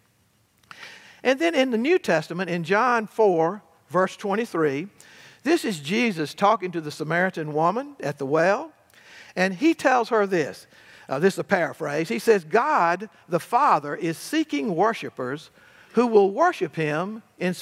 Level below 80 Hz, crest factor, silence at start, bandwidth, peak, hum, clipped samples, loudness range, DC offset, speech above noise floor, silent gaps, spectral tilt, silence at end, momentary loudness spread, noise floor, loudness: -80 dBFS; 20 dB; 0.8 s; 16 kHz; -4 dBFS; none; under 0.1%; 2 LU; under 0.1%; 41 dB; none; -5.5 dB/octave; 0 s; 11 LU; -64 dBFS; -23 LUFS